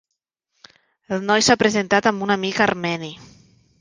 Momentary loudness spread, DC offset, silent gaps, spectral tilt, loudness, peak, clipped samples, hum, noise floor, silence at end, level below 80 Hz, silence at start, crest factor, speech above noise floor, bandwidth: 12 LU; under 0.1%; none; -3.5 dB/octave; -19 LUFS; -2 dBFS; under 0.1%; none; -79 dBFS; 0.55 s; -56 dBFS; 1.1 s; 20 dB; 60 dB; 10 kHz